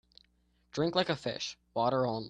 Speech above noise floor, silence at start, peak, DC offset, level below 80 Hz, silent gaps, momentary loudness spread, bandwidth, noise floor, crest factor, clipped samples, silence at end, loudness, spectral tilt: 39 dB; 0.75 s; -14 dBFS; under 0.1%; -66 dBFS; none; 8 LU; 9.6 kHz; -71 dBFS; 20 dB; under 0.1%; 0 s; -33 LUFS; -5 dB/octave